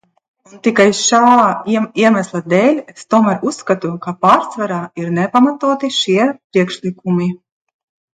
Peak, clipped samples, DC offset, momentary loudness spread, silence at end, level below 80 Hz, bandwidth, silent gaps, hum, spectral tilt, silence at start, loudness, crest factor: 0 dBFS; under 0.1%; under 0.1%; 10 LU; 0.8 s; -62 dBFS; 9.4 kHz; 6.44-6.50 s; none; -4.5 dB/octave; 0.55 s; -14 LUFS; 14 dB